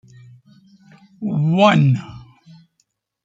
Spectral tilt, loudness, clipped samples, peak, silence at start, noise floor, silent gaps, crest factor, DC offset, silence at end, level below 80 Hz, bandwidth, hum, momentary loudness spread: -7.5 dB/octave; -17 LUFS; under 0.1%; -2 dBFS; 1.2 s; -68 dBFS; none; 18 dB; under 0.1%; 1.05 s; -60 dBFS; 7.8 kHz; none; 16 LU